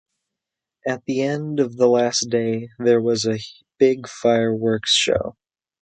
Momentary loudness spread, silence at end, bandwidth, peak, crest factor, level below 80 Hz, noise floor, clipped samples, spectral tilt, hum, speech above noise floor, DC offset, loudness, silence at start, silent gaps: 10 LU; 0.5 s; 9.4 kHz; -4 dBFS; 18 dB; -54 dBFS; -85 dBFS; under 0.1%; -4 dB/octave; none; 66 dB; under 0.1%; -20 LUFS; 0.85 s; none